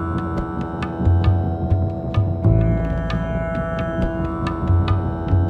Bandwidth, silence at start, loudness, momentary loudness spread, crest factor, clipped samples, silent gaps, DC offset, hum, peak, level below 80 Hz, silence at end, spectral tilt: 5.2 kHz; 0 s; -21 LUFS; 6 LU; 16 dB; under 0.1%; none; under 0.1%; none; -4 dBFS; -28 dBFS; 0 s; -9.5 dB/octave